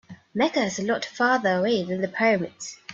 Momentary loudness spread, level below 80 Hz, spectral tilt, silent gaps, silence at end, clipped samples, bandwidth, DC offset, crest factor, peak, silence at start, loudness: 9 LU; -68 dBFS; -4.5 dB/octave; none; 0 s; under 0.1%; 8 kHz; under 0.1%; 16 dB; -8 dBFS; 0.1 s; -24 LUFS